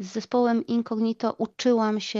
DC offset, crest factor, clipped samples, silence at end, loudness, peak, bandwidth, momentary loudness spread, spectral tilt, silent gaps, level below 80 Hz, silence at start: under 0.1%; 14 dB; under 0.1%; 0 s; -25 LUFS; -10 dBFS; 7.6 kHz; 5 LU; -5.5 dB/octave; none; -72 dBFS; 0 s